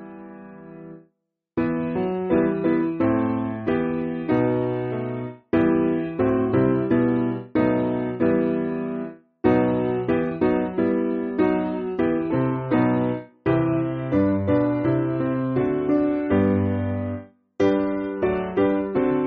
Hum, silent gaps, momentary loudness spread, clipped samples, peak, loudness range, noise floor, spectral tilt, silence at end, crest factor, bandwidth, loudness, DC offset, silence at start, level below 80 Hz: none; none; 8 LU; under 0.1%; -4 dBFS; 2 LU; -73 dBFS; -8 dB/octave; 0 s; 18 dB; 4.7 kHz; -23 LUFS; under 0.1%; 0 s; -50 dBFS